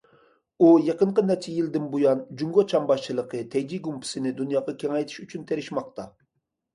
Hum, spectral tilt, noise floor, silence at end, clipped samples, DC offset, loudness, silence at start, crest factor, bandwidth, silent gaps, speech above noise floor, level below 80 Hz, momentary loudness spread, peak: none; -6.5 dB/octave; -78 dBFS; 0.65 s; under 0.1%; under 0.1%; -24 LUFS; 0.6 s; 18 dB; 11.5 kHz; none; 54 dB; -70 dBFS; 13 LU; -6 dBFS